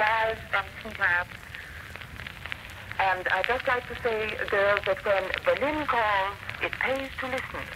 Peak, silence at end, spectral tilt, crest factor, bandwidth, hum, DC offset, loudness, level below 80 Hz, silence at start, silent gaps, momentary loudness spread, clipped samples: -6 dBFS; 0 s; -4.5 dB/octave; 22 dB; 16 kHz; none; under 0.1%; -27 LUFS; -50 dBFS; 0 s; none; 15 LU; under 0.1%